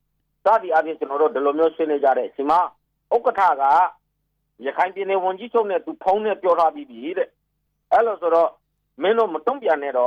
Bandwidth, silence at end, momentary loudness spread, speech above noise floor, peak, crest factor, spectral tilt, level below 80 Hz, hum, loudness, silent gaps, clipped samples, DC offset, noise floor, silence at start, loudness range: 7.2 kHz; 0 s; 8 LU; 53 dB; -8 dBFS; 14 dB; -5.5 dB/octave; -68 dBFS; none; -21 LUFS; none; under 0.1%; under 0.1%; -73 dBFS; 0.45 s; 3 LU